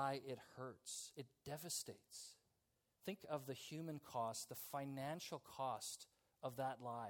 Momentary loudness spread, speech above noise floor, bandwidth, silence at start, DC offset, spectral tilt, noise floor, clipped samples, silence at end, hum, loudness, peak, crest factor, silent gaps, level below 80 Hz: 10 LU; 36 dB; 18 kHz; 0 s; under 0.1%; -4 dB/octave; -86 dBFS; under 0.1%; 0 s; none; -50 LUFS; -30 dBFS; 20 dB; none; -86 dBFS